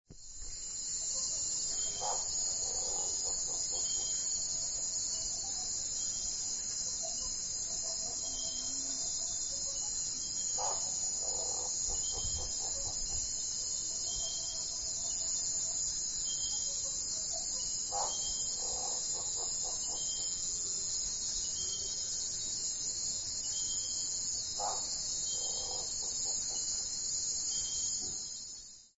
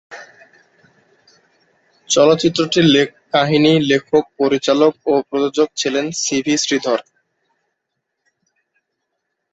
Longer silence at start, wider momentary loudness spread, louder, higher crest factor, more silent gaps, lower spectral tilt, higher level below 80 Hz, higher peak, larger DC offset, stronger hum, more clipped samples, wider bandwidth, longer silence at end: about the same, 0.1 s vs 0.1 s; second, 2 LU vs 6 LU; second, -33 LUFS vs -16 LUFS; about the same, 14 dB vs 18 dB; neither; second, 0.5 dB/octave vs -4 dB/octave; about the same, -56 dBFS vs -60 dBFS; second, -22 dBFS vs 0 dBFS; neither; neither; neither; about the same, 8.2 kHz vs 8.2 kHz; second, 0.1 s vs 2.5 s